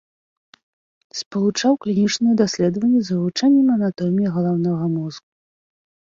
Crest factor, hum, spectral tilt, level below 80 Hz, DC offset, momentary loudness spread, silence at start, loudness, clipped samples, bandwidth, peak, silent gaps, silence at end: 14 dB; none; -6 dB/octave; -62 dBFS; under 0.1%; 10 LU; 1.15 s; -19 LUFS; under 0.1%; 7.6 kHz; -6 dBFS; 1.26-1.31 s; 0.95 s